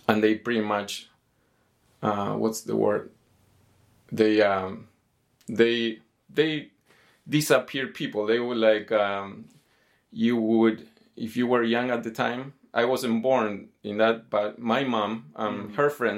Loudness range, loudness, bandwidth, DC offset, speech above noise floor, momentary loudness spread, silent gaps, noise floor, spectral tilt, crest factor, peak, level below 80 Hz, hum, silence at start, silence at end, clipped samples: 2 LU; -25 LUFS; 16.5 kHz; under 0.1%; 43 dB; 13 LU; none; -68 dBFS; -5 dB/octave; 24 dB; -4 dBFS; -74 dBFS; none; 0.1 s; 0 s; under 0.1%